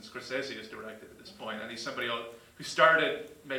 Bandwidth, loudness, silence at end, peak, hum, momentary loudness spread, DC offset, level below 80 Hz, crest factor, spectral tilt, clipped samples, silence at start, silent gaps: 18 kHz; -30 LUFS; 0 s; -6 dBFS; none; 22 LU; under 0.1%; -72 dBFS; 26 dB; -3 dB/octave; under 0.1%; 0 s; none